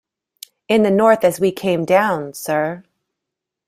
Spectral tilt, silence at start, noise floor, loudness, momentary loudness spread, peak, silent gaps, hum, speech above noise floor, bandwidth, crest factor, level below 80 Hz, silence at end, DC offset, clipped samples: -5.5 dB/octave; 0.7 s; -82 dBFS; -17 LUFS; 10 LU; -2 dBFS; none; none; 66 dB; 16 kHz; 16 dB; -60 dBFS; 0.85 s; under 0.1%; under 0.1%